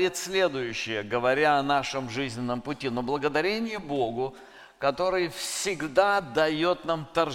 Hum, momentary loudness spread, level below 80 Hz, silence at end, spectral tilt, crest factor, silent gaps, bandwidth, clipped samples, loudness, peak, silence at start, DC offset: none; 8 LU; -58 dBFS; 0 s; -4 dB/octave; 20 dB; none; 17 kHz; under 0.1%; -27 LUFS; -8 dBFS; 0 s; under 0.1%